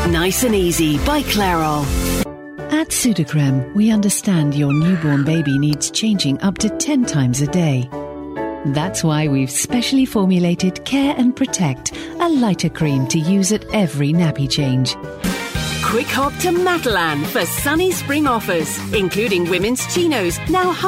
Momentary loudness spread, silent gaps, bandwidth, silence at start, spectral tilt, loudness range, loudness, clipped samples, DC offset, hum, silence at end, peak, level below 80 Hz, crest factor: 5 LU; none; 16.5 kHz; 0 s; -5 dB/octave; 2 LU; -17 LUFS; under 0.1%; under 0.1%; none; 0 s; -4 dBFS; -36 dBFS; 12 dB